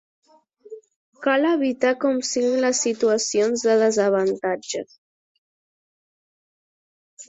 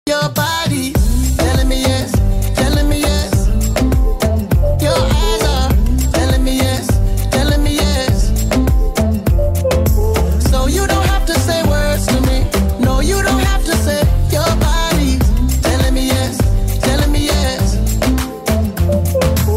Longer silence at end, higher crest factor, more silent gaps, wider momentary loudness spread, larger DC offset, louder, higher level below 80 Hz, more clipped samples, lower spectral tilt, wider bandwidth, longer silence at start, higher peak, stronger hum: about the same, 0.05 s vs 0 s; first, 18 dB vs 8 dB; first, 0.96-1.13 s, 4.98-7.17 s vs none; first, 9 LU vs 2 LU; neither; second, -21 LUFS vs -15 LUFS; second, -70 dBFS vs -16 dBFS; neither; second, -3 dB/octave vs -5 dB/octave; second, 8.4 kHz vs 16.5 kHz; first, 0.7 s vs 0.05 s; about the same, -6 dBFS vs -4 dBFS; neither